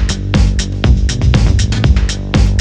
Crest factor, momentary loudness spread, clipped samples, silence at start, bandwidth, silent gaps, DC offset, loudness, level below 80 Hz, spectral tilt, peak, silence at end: 10 dB; 3 LU; under 0.1%; 0 s; 9.6 kHz; none; under 0.1%; -13 LUFS; -14 dBFS; -5.5 dB/octave; 0 dBFS; 0 s